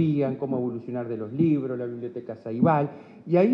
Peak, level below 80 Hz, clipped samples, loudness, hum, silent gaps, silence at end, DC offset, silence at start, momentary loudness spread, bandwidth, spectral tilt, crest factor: -8 dBFS; -70 dBFS; under 0.1%; -27 LUFS; none; none; 0 s; under 0.1%; 0 s; 13 LU; 5.4 kHz; -11 dB/octave; 16 dB